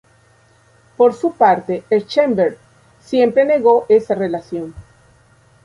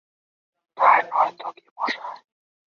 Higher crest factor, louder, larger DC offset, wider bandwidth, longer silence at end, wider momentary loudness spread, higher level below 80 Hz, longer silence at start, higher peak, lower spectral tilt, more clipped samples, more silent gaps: second, 16 dB vs 22 dB; first, -16 LUFS vs -21 LUFS; neither; first, 11 kHz vs 6.8 kHz; first, 0.85 s vs 0.55 s; second, 10 LU vs 19 LU; first, -54 dBFS vs -86 dBFS; first, 1 s vs 0.75 s; about the same, -2 dBFS vs -4 dBFS; first, -6.5 dB/octave vs -3 dB/octave; neither; second, none vs 1.71-1.76 s